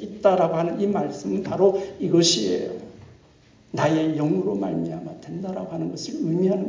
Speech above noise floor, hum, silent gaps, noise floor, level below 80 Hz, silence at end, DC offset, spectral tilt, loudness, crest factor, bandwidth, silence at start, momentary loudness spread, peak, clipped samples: 31 dB; none; none; -54 dBFS; -60 dBFS; 0 s; under 0.1%; -5 dB/octave; -23 LUFS; 18 dB; 7.6 kHz; 0 s; 13 LU; -4 dBFS; under 0.1%